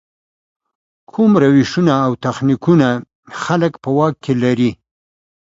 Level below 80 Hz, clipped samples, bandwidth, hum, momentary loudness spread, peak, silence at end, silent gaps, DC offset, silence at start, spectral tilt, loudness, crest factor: -52 dBFS; under 0.1%; 7.8 kHz; none; 8 LU; 0 dBFS; 0.7 s; 3.15-3.23 s; under 0.1%; 1.15 s; -7.5 dB/octave; -15 LUFS; 16 dB